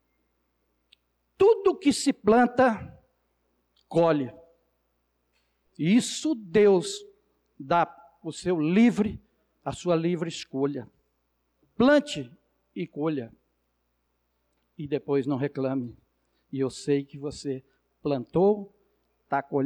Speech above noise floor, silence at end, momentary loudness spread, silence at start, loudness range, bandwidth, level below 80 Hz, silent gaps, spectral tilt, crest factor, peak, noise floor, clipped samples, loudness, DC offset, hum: 50 dB; 0 s; 17 LU; 1.4 s; 7 LU; 12.5 kHz; -60 dBFS; none; -5.5 dB/octave; 16 dB; -12 dBFS; -75 dBFS; under 0.1%; -26 LUFS; under 0.1%; 60 Hz at -55 dBFS